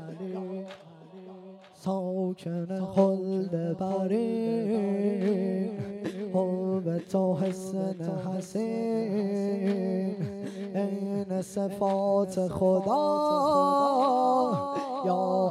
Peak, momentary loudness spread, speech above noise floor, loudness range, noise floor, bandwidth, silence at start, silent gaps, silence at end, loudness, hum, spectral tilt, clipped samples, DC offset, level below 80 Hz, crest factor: -10 dBFS; 11 LU; 21 dB; 5 LU; -48 dBFS; 12.5 kHz; 0 s; none; 0 s; -28 LUFS; none; -7.5 dB/octave; under 0.1%; under 0.1%; -68 dBFS; 18 dB